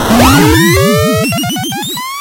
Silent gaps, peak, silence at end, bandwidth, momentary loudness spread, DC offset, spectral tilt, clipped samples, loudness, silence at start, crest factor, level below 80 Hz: none; 0 dBFS; 0 s; over 20 kHz; 10 LU; under 0.1%; -4.5 dB/octave; 0.7%; -9 LUFS; 0 s; 10 dB; -26 dBFS